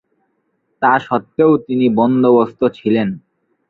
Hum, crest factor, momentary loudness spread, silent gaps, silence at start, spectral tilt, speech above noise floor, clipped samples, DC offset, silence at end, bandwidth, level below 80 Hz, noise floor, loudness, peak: none; 14 dB; 7 LU; none; 0.8 s; -9 dB/octave; 52 dB; under 0.1%; under 0.1%; 0.5 s; 4.6 kHz; -58 dBFS; -66 dBFS; -15 LUFS; -2 dBFS